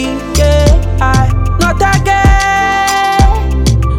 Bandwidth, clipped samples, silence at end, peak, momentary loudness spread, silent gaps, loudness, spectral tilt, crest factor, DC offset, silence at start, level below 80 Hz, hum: 17 kHz; under 0.1%; 0 s; 0 dBFS; 4 LU; none; -10 LUFS; -5 dB/octave; 10 dB; under 0.1%; 0 s; -14 dBFS; none